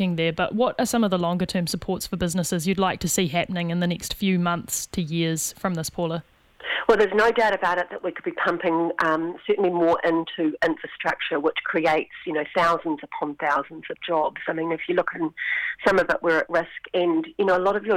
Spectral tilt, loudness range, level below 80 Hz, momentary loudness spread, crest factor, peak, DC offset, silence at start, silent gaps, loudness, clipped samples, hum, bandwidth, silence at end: -4.5 dB/octave; 3 LU; -52 dBFS; 7 LU; 20 dB; -4 dBFS; under 0.1%; 0 s; none; -24 LUFS; under 0.1%; none; 17 kHz; 0 s